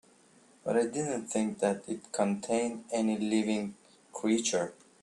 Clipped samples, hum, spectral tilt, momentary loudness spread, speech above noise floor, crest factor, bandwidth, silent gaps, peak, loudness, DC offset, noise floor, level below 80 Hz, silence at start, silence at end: under 0.1%; none; -4.5 dB/octave; 8 LU; 31 dB; 18 dB; 11.5 kHz; none; -14 dBFS; -32 LUFS; under 0.1%; -61 dBFS; -74 dBFS; 0.65 s; 0.3 s